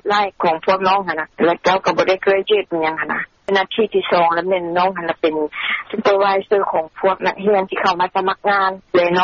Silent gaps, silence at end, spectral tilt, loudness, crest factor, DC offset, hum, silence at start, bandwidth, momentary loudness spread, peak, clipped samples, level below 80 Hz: none; 0 s; -2 dB/octave; -17 LUFS; 14 dB; under 0.1%; none; 0.05 s; 7.2 kHz; 5 LU; -2 dBFS; under 0.1%; -56 dBFS